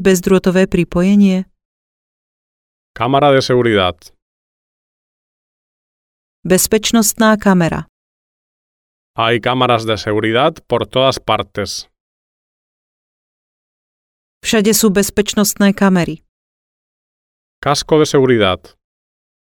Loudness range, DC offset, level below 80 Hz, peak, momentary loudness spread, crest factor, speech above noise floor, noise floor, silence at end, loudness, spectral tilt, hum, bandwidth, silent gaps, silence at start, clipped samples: 5 LU; under 0.1%; -42 dBFS; 0 dBFS; 11 LU; 16 dB; over 77 dB; under -90 dBFS; 0.9 s; -14 LUFS; -4.5 dB/octave; none; 19 kHz; 1.65-2.94 s, 4.22-6.43 s, 7.89-9.14 s, 12.00-14.41 s, 16.29-17.62 s; 0 s; under 0.1%